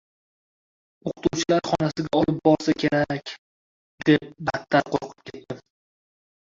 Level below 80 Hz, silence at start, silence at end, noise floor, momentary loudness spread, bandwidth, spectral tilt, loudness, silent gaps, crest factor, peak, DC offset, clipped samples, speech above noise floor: -56 dBFS; 1.05 s; 1 s; under -90 dBFS; 18 LU; 7.6 kHz; -5.5 dB/octave; -23 LUFS; 3.38-3.98 s; 22 dB; -4 dBFS; under 0.1%; under 0.1%; over 67 dB